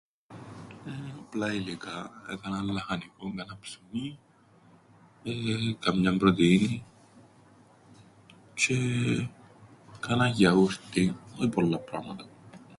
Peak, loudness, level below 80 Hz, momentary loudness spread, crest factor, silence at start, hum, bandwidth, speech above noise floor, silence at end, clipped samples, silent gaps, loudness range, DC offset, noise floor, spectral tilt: -8 dBFS; -28 LUFS; -58 dBFS; 19 LU; 22 dB; 0.3 s; none; 11.5 kHz; 31 dB; 0 s; under 0.1%; none; 9 LU; under 0.1%; -59 dBFS; -5.5 dB/octave